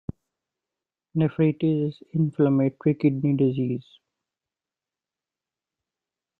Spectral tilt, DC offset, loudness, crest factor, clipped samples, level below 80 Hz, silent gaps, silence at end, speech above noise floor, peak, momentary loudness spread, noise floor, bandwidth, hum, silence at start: -11.5 dB/octave; under 0.1%; -24 LUFS; 18 dB; under 0.1%; -62 dBFS; none; 2.6 s; over 67 dB; -8 dBFS; 8 LU; under -90 dBFS; 4.5 kHz; none; 1.15 s